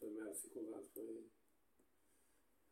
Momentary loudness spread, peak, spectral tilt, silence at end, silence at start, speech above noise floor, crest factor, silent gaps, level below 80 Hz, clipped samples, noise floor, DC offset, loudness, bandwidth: 8 LU; -36 dBFS; -4 dB/octave; 0.9 s; 0 s; 28 dB; 18 dB; none; -90 dBFS; under 0.1%; -80 dBFS; under 0.1%; -51 LUFS; 16.5 kHz